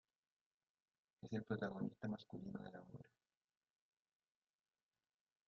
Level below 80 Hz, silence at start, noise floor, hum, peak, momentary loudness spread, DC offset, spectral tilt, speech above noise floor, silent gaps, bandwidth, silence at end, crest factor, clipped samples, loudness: -82 dBFS; 1.25 s; under -90 dBFS; none; -32 dBFS; 17 LU; under 0.1%; -6.5 dB/octave; over 42 dB; none; 7 kHz; 2.45 s; 22 dB; under 0.1%; -49 LUFS